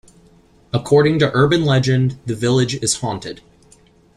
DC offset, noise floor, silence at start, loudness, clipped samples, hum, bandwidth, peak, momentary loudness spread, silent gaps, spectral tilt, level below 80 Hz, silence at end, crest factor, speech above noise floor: under 0.1%; -51 dBFS; 0.75 s; -17 LUFS; under 0.1%; none; 12.5 kHz; -2 dBFS; 11 LU; none; -5.5 dB/octave; -48 dBFS; 0.8 s; 16 dB; 35 dB